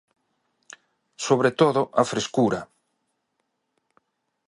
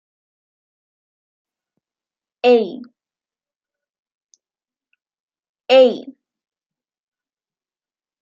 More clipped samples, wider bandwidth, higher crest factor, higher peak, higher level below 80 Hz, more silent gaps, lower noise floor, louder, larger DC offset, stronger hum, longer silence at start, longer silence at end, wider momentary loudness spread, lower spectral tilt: neither; first, 11.5 kHz vs 7.2 kHz; about the same, 22 dB vs 22 dB; about the same, -4 dBFS vs -2 dBFS; first, -66 dBFS vs -82 dBFS; second, none vs 3.56-3.60 s, 3.99-4.03 s, 4.15-4.27 s, 5.20-5.28 s, 5.49-5.55 s; second, -76 dBFS vs under -90 dBFS; second, -22 LUFS vs -15 LUFS; neither; neither; second, 1.2 s vs 2.45 s; second, 1.85 s vs 2.1 s; second, 8 LU vs 23 LU; first, -5 dB/octave vs -1.5 dB/octave